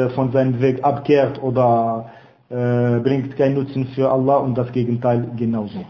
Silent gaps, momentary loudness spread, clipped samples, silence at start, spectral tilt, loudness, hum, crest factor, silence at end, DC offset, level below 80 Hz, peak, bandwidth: none; 6 LU; under 0.1%; 0 s; -10 dB/octave; -19 LUFS; none; 16 dB; 0 s; under 0.1%; -54 dBFS; -4 dBFS; 6 kHz